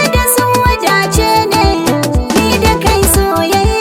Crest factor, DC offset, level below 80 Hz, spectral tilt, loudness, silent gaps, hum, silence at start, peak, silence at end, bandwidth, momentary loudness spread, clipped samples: 10 dB; under 0.1%; -20 dBFS; -4 dB/octave; -11 LUFS; none; none; 0 s; 0 dBFS; 0 s; 18 kHz; 3 LU; under 0.1%